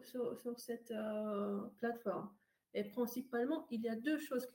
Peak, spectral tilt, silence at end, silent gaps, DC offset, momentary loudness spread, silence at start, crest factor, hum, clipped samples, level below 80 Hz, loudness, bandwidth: -26 dBFS; -5.5 dB/octave; 0.05 s; none; under 0.1%; 7 LU; 0 s; 14 dB; none; under 0.1%; -88 dBFS; -42 LUFS; 17 kHz